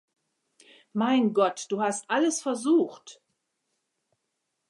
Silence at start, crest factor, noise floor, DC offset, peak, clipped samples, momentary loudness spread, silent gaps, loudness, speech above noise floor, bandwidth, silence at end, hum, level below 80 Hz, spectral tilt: 0.95 s; 18 dB; -80 dBFS; under 0.1%; -10 dBFS; under 0.1%; 6 LU; none; -26 LUFS; 55 dB; 11.5 kHz; 1.55 s; none; -84 dBFS; -4 dB/octave